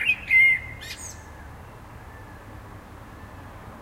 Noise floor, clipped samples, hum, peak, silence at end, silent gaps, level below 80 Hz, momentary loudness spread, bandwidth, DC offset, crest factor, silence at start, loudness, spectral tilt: -43 dBFS; under 0.1%; none; -10 dBFS; 0 s; none; -48 dBFS; 28 LU; 16 kHz; under 0.1%; 18 dB; 0 s; -17 LUFS; -2.5 dB/octave